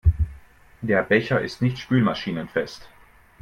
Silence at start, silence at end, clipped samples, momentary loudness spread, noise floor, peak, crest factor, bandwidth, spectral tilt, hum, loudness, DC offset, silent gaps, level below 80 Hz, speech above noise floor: 0.05 s; 0.55 s; under 0.1%; 12 LU; -48 dBFS; -4 dBFS; 18 dB; 10.5 kHz; -7.5 dB/octave; none; -23 LUFS; under 0.1%; none; -34 dBFS; 25 dB